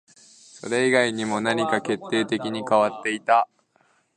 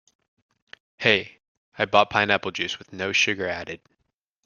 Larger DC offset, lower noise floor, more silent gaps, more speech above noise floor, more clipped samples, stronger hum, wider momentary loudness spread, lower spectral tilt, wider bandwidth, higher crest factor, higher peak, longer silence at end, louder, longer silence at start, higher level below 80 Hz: neither; second, -64 dBFS vs -76 dBFS; second, none vs 1.48-1.72 s; second, 41 dB vs 53 dB; neither; neither; second, 7 LU vs 14 LU; about the same, -4 dB/octave vs -3 dB/octave; about the same, 11 kHz vs 10 kHz; second, 18 dB vs 24 dB; second, -6 dBFS vs -2 dBFS; about the same, 0.7 s vs 0.7 s; about the same, -23 LUFS vs -23 LUFS; second, 0.55 s vs 1 s; second, -70 dBFS vs -64 dBFS